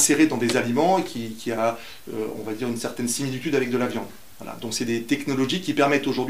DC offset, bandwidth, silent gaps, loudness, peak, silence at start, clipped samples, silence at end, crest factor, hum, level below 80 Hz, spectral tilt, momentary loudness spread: 0.7%; 16 kHz; none; -24 LUFS; -6 dBFS; 0 s; under 0.1%; 0 s; 18 dB; none; -62 dBFS; -4 dB/octave; 13 LU